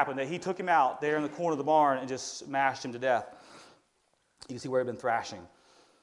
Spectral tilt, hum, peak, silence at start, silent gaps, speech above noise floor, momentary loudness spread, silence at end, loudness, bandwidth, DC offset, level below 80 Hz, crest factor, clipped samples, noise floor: -4.5 dB/octave; none; -12 dBFS; 0 s; none; 43 dB; 14 LU; 0.55 s; -30 LUFS; 11.5 kHz; under 0.1%; -76 dBFS; 20 dB; under 0.1%; -73 dBFS